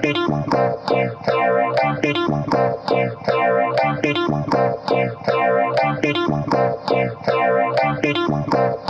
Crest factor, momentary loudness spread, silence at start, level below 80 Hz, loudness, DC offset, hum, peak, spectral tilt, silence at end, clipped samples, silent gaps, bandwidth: 14 dB; 3 LU; 0 s; -50 dBFS; -19 LUFS; under 0.1%; none; -6 dBFS; -7 dB/octave; 0 s; under 0.1%; none; 8.2 kHz